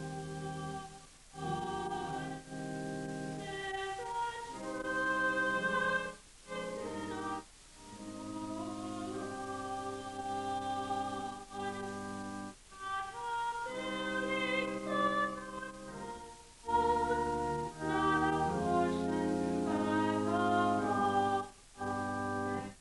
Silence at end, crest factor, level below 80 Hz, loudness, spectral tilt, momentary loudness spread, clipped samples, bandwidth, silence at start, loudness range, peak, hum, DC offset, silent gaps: 0 s; 18 dB; -60 dBFS; -36 LUFS; -5 dB/octave; 14 LU; under 0.1%; 11.5 kHz; 0 s; 8 LU; -18 dBFS; none; under 0.1%; none